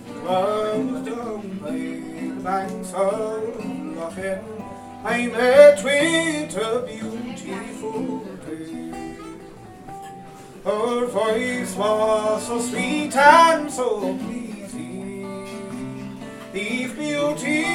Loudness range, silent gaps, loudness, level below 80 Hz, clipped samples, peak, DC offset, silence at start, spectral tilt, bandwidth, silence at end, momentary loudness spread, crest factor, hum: 11 LU; none; -21 LUFS; -56 dBFS; under 0.1%; 0 dBFS; under 0.1%; 0 s; -4 dB/octave; 15 kHz; 0 s; 19 LU; 22 dB; none